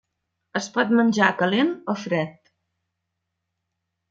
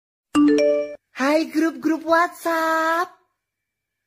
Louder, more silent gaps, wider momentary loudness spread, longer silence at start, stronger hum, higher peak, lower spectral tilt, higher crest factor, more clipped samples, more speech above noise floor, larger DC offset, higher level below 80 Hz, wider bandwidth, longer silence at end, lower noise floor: about the same, -22 LUFS vs -20 LUFS; neither; first, 11 LU vs 7 LU; first, 0.55 s vs 0.35 s; neither; about the same, -2 dBFS vs -4 dBFS; first, -5 dB/octave vs -3.5 dB/octave; first, 22 dB vs 16 dB; neither; about the same, 59 dB vs 62 dB; neither; second, -72 dBFS vs -64 dBFS; second, 7.8 kHz vs 16 kHz; first, 1.8 s vs 1 s; about the same, -80 dBFS vs -81 dBFS